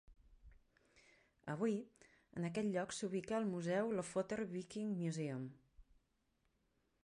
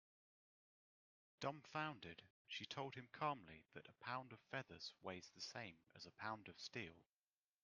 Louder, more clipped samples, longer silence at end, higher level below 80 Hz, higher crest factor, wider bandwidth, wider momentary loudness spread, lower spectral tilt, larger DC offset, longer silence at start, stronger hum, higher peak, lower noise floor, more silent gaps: first, -42 LUFS vs -52 LUFS; neither; first, 1.2 s vs 0.6 s; first, -72 dBFS vs -88 dBFS; second, 18 dB vs 24 dB; first, 11 kHz vs 9 kHz; second, 9 LU vs 12 LU; first, -6 dB/octave vs -4 dB/octave; neither; second, 0.1 s vs 1.4 s; neither; first, -26 dBFS vs -30 dBFS; second, -82 dBFS vs under -90 dBFS; second, none vs 2.30-2.45 s